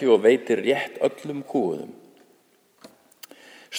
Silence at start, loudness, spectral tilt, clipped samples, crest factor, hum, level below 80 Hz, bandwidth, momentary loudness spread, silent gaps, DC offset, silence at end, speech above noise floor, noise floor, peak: 0 s; -23 LUFS; -5 dB/octave; under 0.1%; 20 dB; none; -80 dBFS; over 20 kHz; 26 LU; none; under 0.1%; 0 s; 39 dB; -61 dBFS; -6 dBFS